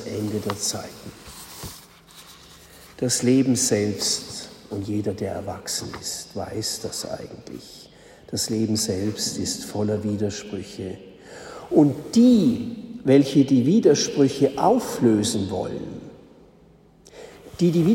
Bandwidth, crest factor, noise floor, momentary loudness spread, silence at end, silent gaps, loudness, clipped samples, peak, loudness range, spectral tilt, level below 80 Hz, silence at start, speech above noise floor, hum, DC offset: 16.5 kHz; 20 dB; -53 dBFS; 21 LU; 0 s; none; -22 LUFS; under 0.1%; -4 dBFS; 10 LU; -5 dB/octave; -56 dBFS; 0 s; 31 dB; none; under 0.1%